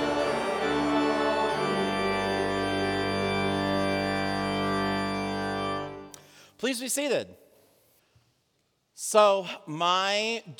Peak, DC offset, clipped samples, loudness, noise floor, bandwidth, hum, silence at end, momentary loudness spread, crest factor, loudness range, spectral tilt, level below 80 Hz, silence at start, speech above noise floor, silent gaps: -6 dBFS; under 0.1%; under 0.1%; -27 LUFS; -73 dBFS; 20 kHz; none; 0.05 s; 8 LU; 22 dB; 6 LU; -4 dB/octave; -54 dBFS; 0 s; 47 dB; none